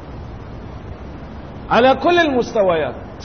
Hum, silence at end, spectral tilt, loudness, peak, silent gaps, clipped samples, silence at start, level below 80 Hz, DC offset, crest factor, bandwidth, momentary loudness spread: none; 0 s; -6 dB/octave; -16 LUFS; -2 dBFS; none; under 0.1%; 0 s; -38 dBFS; 0.5%; 16 dB; 6.6 kHz; 20 LU